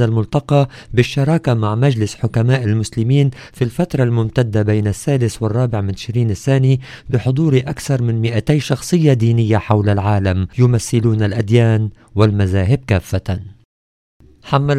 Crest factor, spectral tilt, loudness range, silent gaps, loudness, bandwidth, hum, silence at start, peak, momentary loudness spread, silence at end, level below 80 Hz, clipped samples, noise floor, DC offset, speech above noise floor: 16 dB; -7 dB/octave; 2 LU; 13.65-14.20 s; -16 LUFS; 13.5 kHz; none; 0 s; 0 dBFS; 5 LU; 0 s; -40 dBFS; under 0.1%; under -90 dBFS; under 0.1%; over 75 dB